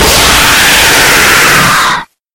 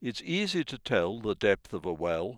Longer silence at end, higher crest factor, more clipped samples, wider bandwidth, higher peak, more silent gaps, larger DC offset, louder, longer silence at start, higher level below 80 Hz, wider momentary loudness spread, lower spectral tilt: first, 0.3 s vs 0 s; second, 6 dB vs 20 dB; first, 4% vs under 0.1%; first, over 20 kHz vs 12.5 kHz; first, 0 dBFS vs -10 dBFS; neither; neither; first, -4 LUFS vs -30 LUFS; about the same, 0 s vs 0 s; first, -24 dBFS vs -58 dBFS; about the same, 5 LU vs 5 LU; second, -1.5 dB/octave vs -5 dB/octave